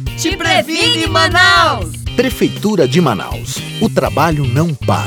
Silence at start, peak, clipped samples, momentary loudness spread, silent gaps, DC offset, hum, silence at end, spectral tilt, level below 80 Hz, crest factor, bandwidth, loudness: 0 s; 0 dBFS; under 0.1%; 11 LU; none; under 0.1%; none; 0 s; -4.5 dB/octave; -32 dBFS; 14 dB; over 20 kHz; -13 LUFS